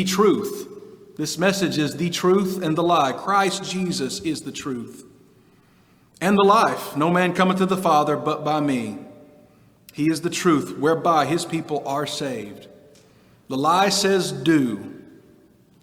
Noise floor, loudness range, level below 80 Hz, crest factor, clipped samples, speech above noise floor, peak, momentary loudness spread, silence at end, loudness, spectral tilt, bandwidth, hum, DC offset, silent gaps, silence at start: -56 dBFS; 4 LU; -62 dBFS; 18 dB; under 0.1%; 35 dB; -4 dBFS; 14 LU; 0.8 s; -21 LUFS; -5 dB/octave; 19.5 kHz; none; under 0.1%; none; 0 s